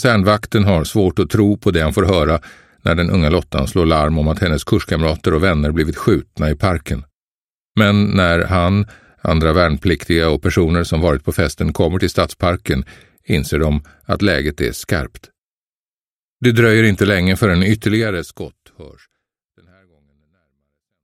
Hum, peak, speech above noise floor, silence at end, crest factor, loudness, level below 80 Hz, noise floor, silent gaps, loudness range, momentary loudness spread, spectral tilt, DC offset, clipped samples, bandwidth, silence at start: none; 0 dBFS; over 75 dB; 2.15 s; 16 dB; -16 LUFS; -30 dBFS; under -90 dBFS; 7.15-7.75 s, 15.38-16.39 s; 4 LU; 8 LU; -6.5 dB/octave; under 0.1%; under 0.1%; 16 kHz; 0 s